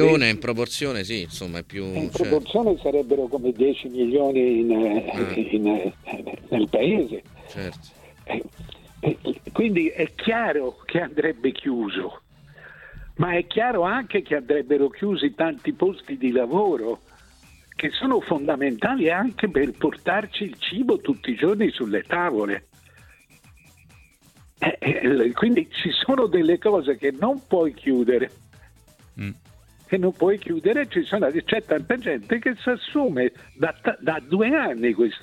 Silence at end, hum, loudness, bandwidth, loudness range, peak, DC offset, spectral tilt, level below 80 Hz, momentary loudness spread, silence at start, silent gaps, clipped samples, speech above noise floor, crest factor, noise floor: 0.05 s; none; -23 LUFS; 13.5 kHz; 5 LU; -2 dBFS; under 0.1%; -6 dB/octave; -54 dBFS; 11 LU; 0 s; none; under 0.1%; 32 dB; 20 dB; -54 dBFS